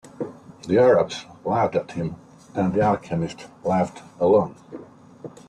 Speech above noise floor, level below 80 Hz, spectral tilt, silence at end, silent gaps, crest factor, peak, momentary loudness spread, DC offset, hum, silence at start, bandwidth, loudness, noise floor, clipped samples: 20 dB; -56 dBFS; -7 dB/octave; 0.2 s; none; 18 dB; -6 dBFS; 23 LU; under 0.1%; none; 0.2 s; 10 kHz; -23 LUFS; -42 dBFS; under 0.1%